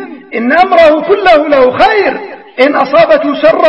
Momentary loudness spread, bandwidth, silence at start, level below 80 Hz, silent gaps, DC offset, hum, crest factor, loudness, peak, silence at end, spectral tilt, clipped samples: 10 LU; 7.8 kHz; 0 s; -42 dBFS; none; under 0.1%; none; 8 dB; -8 LUFS; 0 dBFS; 0 s; -5.5 dB/octave; 1%